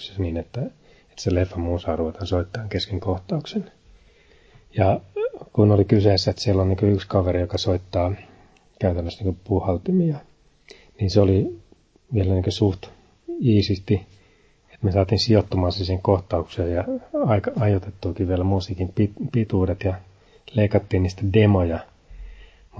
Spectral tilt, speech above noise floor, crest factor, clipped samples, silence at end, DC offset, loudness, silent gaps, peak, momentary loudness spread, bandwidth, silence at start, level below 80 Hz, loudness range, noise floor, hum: -7.5 dB/octave; 36 dB; 20 dB; under 0.1%; 0 s; under 0.1%; -22 LUFS; none; -2 dBFS; 11 LU; 7.8 kHz; 0 s; -36 dBFS; 6 LU; -57 dBFS; none